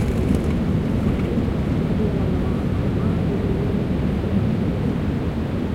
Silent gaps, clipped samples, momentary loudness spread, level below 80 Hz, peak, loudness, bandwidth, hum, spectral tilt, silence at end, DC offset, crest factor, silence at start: none; under 0.1%; 2 LU; -30 dBFS; -6 dBFS; -22 LUFS; 15.5 kHz; none; -8.5 dB/octave; 0 s; under 0.1%; 14 dB; 0 s